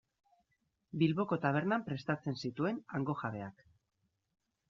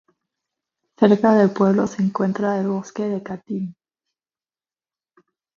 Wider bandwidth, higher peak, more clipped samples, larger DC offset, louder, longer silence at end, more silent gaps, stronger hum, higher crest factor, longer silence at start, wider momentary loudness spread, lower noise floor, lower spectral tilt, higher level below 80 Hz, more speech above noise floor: about the same, 7.2 kHz vs 7.2 kHz; second, -16 dBFS vs 0 dBFS; neither; neither; second, -36 LUFS vs -20 LUFS; second, 1.2 s vs 1.85 s; neither; neither; about the same, 22 dB vs 22 dB; about the same, 0.95 s vs 1 s; second, 10 LU vs 14 LU; second, -82 dBFS vs under -90 dBFS; second, -6 dB/octave vs -8 dB/octave; second, -74 dBFS vs -64 dBFS; second, 47 dB vs over 71 dB